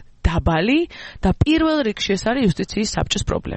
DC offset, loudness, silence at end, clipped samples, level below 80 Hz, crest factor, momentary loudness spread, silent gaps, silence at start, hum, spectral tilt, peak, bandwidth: under 0.1%; -20 LUFS; 0 s; under 0.1%; -30 dBFS; 16 dB; 5 LU; none; 0 s; none; -5.5 dB/octave; -4 dBFS; 8.8 kHz